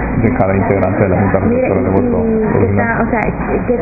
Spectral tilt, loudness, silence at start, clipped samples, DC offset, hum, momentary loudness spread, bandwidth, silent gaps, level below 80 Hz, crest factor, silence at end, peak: -12.5 dB/octave; -13 LUFS; 0 s; under 0.1%; under 0.1%; none; 3 LU; 2.7 kHz; none; -26 dBFS; 12 dB; 0 s; 0 dBFS